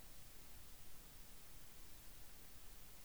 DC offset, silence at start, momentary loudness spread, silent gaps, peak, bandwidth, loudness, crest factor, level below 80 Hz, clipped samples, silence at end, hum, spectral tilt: 0.1%; 0 s; 0 LU; none; -42 dBFS; over 20 kHz; -58 LUFS; 12 dB; -64 dBFS; under 0.1%; 0 s; none; -2.5 dB/octave